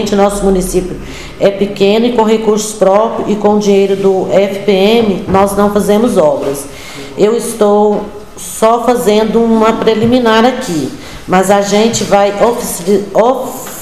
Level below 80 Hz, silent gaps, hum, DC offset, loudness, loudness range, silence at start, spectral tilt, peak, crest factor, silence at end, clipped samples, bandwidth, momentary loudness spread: -34 dBFS; none; none; 2%; -10 LUFS; 2 LU; 0 s; -5 dB/octave; 0 dBFS; 10 dB; 0 s; 0.4%; 15 kHz; 9 LU